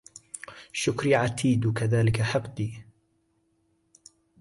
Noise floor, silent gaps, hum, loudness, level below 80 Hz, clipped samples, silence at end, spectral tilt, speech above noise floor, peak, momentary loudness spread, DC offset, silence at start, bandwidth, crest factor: -71 dBFS; none; none; -26 LUFS; -54 dBFS; under 0.1%; 1.6 s; -6 dB/octave; 45 dB; -10 dBFS; 17 LU; under 0.1%; 0.15 s; 11.5 kHz; 18 dB